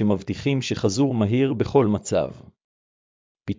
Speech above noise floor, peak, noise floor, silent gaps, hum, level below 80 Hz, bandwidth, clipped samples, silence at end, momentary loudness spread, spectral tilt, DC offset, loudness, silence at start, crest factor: over 68 dB; -6 dBFS; under -90 dBFS; 2.64-3.35 s; none; -48 dBFS; 7.6 kHz; under 0.1%; 0.05 s; 5 LU; -6.5 dB/octave; under 0.1%; -22 LUFS; 0 s; 18 dB